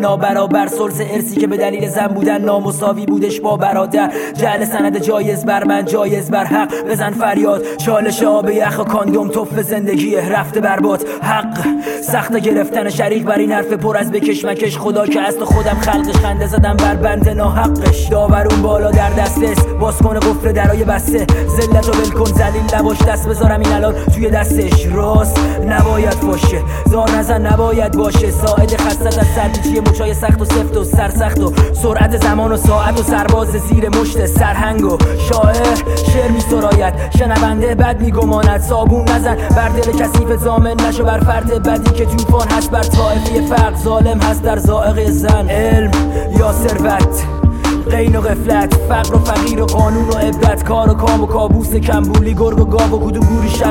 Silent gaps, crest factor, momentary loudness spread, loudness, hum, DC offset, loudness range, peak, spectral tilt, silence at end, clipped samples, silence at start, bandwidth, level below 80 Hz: none; 12 dB; 4 LU; -13 LUFS; none; under 0.1%; 2 LU; 0 dBFS; -6 dB/octave; 0 s; under 0.1%; 0 s; 17 kHz; -18 dBFS